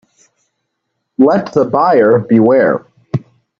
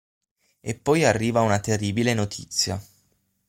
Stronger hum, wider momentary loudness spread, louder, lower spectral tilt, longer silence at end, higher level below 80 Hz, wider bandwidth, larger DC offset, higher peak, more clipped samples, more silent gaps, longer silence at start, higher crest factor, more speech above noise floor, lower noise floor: neither; about the same, 13 LU vs 12 LU; first, -12 LUFS vs -23 LUFS; first, -9 dB/octave vs -4.5 dB/octave; second, 0.4 s vs 0.65 s; about the same, -58 dBFS vs -56 dBFS; second, 7.4 kHz vs 16.5 kHz; neither; first, 0 dBFS vs -6 dBFS; neither; neither; first, 1.2 s vs 0.65 s; second, 12 dB vs 18 dB; first, 61 dB vs 45 dB; about the same, -71 dBFS vs -68 dBFS